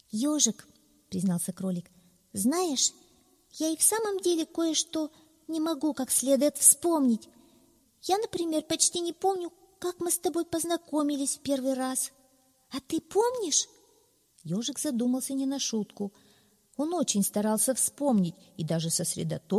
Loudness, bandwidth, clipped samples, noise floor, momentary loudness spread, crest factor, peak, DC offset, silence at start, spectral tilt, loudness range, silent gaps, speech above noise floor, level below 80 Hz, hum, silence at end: -28 LUFS; 15.5 kHz; under 0.1%; -66 dBFS; 13 LU; 26 dB; -4 dBFS; under 0.1%; 0.15 s; -3.5 dB/octave; 6 LU; none; 38 dB; -70 dBFS; none; 0 s